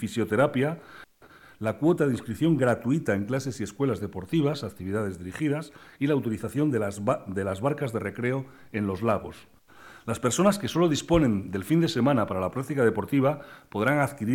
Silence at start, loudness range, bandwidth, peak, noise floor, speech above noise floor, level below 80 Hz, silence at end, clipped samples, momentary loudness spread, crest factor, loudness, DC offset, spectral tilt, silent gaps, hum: 0 s; 4 LU; 17.5 kHz; -8 dBFS; -53 dBFS; 27 dB; -54 dBFS; 0 s; under 0.1%; 10 LU; 18 dB; -27 LUFS; under 0.1%; -6.5 dB/octave; none; none